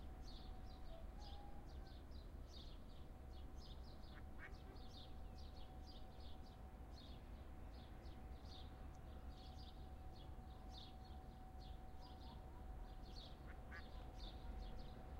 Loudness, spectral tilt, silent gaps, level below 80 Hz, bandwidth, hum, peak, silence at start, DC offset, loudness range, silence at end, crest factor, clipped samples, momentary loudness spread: -58 LUFS; -6 dB/octave; none; -56 dBFS; 16 kHz; none; -40 dBFS; 0 s; under 0.1%; 1 LU; 0 s; 14 dB; under 0.1%; 3 LU